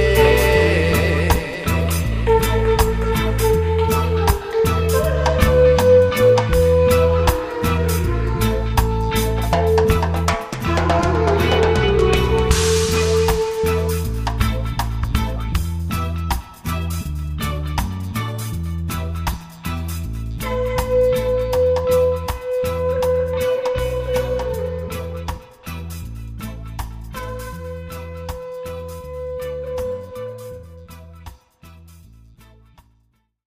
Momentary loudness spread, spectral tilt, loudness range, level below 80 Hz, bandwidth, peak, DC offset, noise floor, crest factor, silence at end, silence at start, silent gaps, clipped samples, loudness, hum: 16 LU; -5.5 dB/octave; 15 LU; -26 dBFS; 15.5 kHz; 0 dBFS; 0.3%; -62 dBFS; 18 dB; 1.45 s; 0 s; none; under 0.1%; -19 LUFS; none